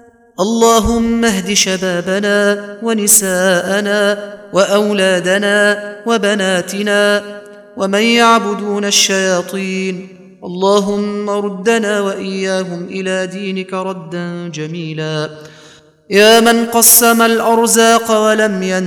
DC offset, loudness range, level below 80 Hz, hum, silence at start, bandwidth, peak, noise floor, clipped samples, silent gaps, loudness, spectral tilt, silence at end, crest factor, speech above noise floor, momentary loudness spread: under 0.1%; 8 LU; -42 dBFS; none; 0.4 s; over 20 kHz; 0 dBFS; -43 dBFS; under 0.1%; none; -13 LUFS; -3 dB/octave; 0 s; 14 dB; 30 dB; 13 LU